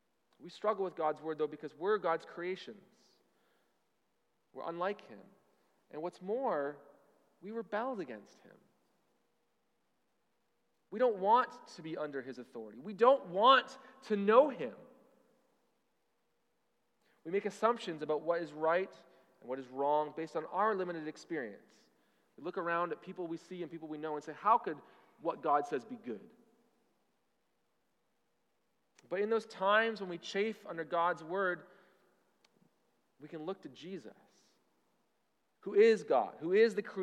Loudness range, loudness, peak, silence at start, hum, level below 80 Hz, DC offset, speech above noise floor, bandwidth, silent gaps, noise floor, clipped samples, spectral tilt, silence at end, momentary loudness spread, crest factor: 14 LU; -34 LUFS; -12 dBFS; 0.4 s; none; under -90 dBFS; under 0.1%; 47 dB; 10.5 kHz; none; -81 dBFS; under 0.1%; -5 dB/octave; 0 s; 19 LU; 24 dB